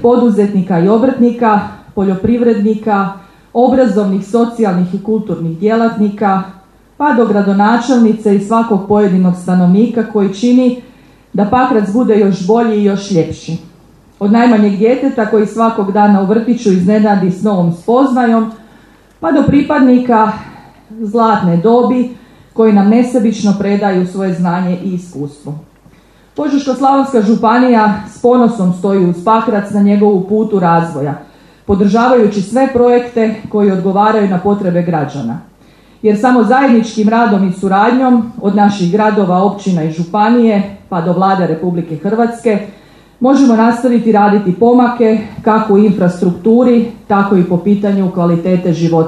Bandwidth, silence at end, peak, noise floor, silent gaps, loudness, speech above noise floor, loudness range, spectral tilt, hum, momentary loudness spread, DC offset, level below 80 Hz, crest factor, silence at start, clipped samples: 10.5 kHz; 0 s; 0 dBFS; -44 dBFS; none; -11 LUFS; 33 dB; 3 LU; -8 dB/octave; none; 8 LU; under 0.1%; -46 dBFS; 10 dB; 0 s; under 0.1%